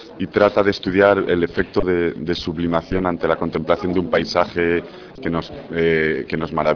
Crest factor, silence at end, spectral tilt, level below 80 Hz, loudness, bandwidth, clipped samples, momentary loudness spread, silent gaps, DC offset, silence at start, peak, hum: 18 dB; 0 s; -7 dB/octave; -42 dBFS; -19 LUFS; 5.4 kHz; under 0.1%; 9 LU; none; under 0.1%; 0 s; 0 dBFS; none